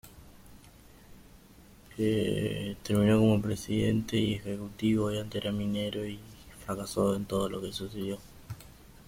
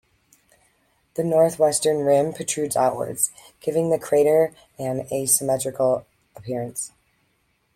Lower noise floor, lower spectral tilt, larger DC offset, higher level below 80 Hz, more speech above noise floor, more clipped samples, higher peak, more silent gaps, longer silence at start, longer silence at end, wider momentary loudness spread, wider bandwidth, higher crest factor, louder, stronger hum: second, -55 dBFS vs -68 dBFS; first, -6.5 dB/octave vs -4 dB/octave; neither; first, -54 dBFS vs -62 dBFS; second, 26 dB vs 46 dB; neither; second, -12 dBFS vs -6 dBFS; neither; second, 0.05 s vs 1.15 s; second, 0.05 s vs 0.9 s; first, 19 LU vs 13 LU; about the same, 16.5 kHz vs 16.5 kHz; about the same, 18 dB vs 18 dB; second, -30 LUFS vs -22 LUFS; neither